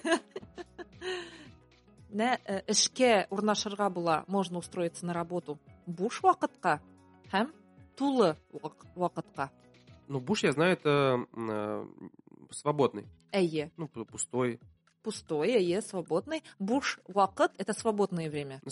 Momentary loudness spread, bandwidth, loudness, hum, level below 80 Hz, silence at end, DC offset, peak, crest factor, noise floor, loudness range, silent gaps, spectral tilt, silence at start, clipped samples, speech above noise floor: 17 LU; 11.5 kHz; -31 LUFS; none; -70 dBFS; 0 s; under 0.1%; -12 dBFS; 20 dB; -59 dBFS; 4 LU; none; -4 dB/octave; 0.05 s; under 0.1%; 28 dB